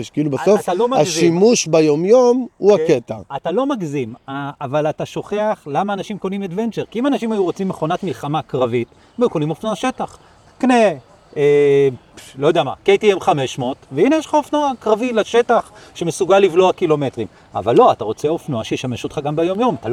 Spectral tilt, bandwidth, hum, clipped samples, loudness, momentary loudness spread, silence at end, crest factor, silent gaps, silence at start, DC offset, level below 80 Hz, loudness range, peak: -5.5 dB/octave; 13.5 kHz; none; under 0.1%; -17 LUFS; 12 LU; 0 s; 16 dB; none; 0 s; under 0.1%; -56 dBFS; 6 LU; 0 dBFS